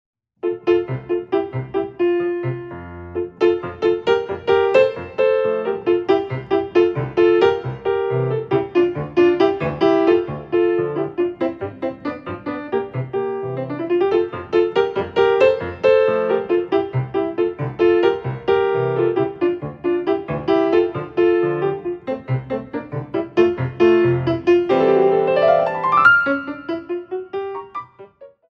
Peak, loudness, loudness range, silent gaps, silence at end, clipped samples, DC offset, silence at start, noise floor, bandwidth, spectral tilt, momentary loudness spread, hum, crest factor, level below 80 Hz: -2 dBFS; -19 LUFS; 5 LU; none; 0.25 s; under 0.1%; under 0.1%; 0.45 s; -43 dBFS; 6.4 kHz; -8.5 dB/octave; 12 LU; none; 16 dB; -52 dBFS